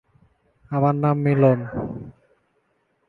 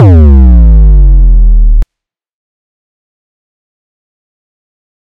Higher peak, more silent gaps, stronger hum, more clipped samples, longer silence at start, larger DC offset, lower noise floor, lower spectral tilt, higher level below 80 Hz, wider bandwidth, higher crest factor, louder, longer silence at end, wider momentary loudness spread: second, -4 dBFS vs 0 dBFS; neither; neither; second, under 0.1% vs 10%; first, 0.7 s vs 0 s; neither; second, -68 dBFS vs -78 dBFS; about the same, -11.5 dB/octave vs -11.5 dB/octave; second, -54 dBFS vs -6 dBFS; first, 4.3 kHz vs 2.4 kHz; first, 20 dB vs 6 dB; second, -21 LUFS vs -6 LUFS; second, 1 s vs 3.3 s; first, 17 LU vs 9 LU